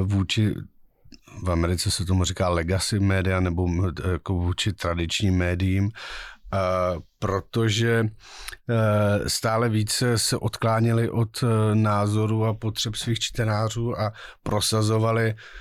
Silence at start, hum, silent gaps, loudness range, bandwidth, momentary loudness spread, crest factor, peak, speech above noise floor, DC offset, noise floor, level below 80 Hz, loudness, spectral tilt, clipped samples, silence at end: 0 s; none; none; 3 LU; 14.5 kHz; 7 LU; 12 dB; -12 dBFS; 27 dB; under 0.1%; -50 dBFS; -42 dBFS; -24 LUFS; -5 dB/octave; under 0.1%; 0 s